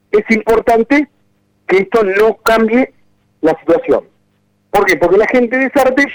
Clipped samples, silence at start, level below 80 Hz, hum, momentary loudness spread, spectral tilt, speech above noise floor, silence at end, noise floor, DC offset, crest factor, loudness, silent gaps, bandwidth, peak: under 0.1%; 0.15 s; -42 dBFS; 50 Hz at -50 dBFS; 6 LU; -5 dB/octave; 47 dB; 0 s; -58 dBFS; under 0.1%; 12 dB; -12 LUFS; none; over 20 kHz; 0 dBFS